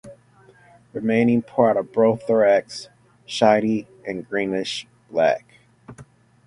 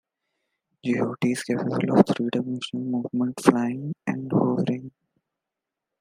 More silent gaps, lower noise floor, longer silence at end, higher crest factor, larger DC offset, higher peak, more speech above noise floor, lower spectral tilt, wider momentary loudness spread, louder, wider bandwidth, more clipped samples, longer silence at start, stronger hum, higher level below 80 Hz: neither; second, -53 dBFS vs -86 dBFS; second, 0.45 s vs 1.1 s; about the same, 20 dB vs 24 dB; neither; about the same, -2 dBFS vs 0 dBFS; second, 33 dB vs 62 dB; about the same, -5.5 dB/octave vs -6.5 dB/octave; first, 14 LU vs 10 LU; first, -21 LUFS vs -25 LUFS; second, 11 kHz vs 15.5 kHz; neither; second, 0.05 s vs 0.85 s; neither; about the same, -62 dBFS vs -66 dBFS